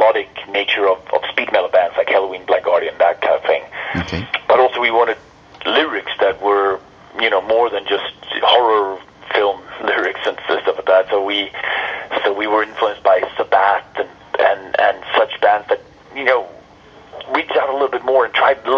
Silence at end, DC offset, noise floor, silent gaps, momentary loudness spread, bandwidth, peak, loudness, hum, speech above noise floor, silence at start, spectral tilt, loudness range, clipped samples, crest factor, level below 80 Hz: 0 s; under 0.1%; -43 dBFS; none; 8 LU; 7 kHz; 0 dBFS; -17 LUFS; none; 27 dB; 0 s; -5 dB/octave; 2 LU; under 0.1%; 16 dB; -52 dBFS